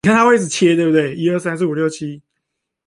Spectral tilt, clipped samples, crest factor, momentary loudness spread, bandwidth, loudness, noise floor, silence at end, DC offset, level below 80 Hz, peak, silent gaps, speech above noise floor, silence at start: -5.5 dB/octave; under 0.1%; 14 dB; 9 LU; 11.5 kHz; -16 LUFS; -76 dBFS; 0.7 s; under 0.1%; -56 dBFS; -2 dBFS; none; 61 dB; 0.05 s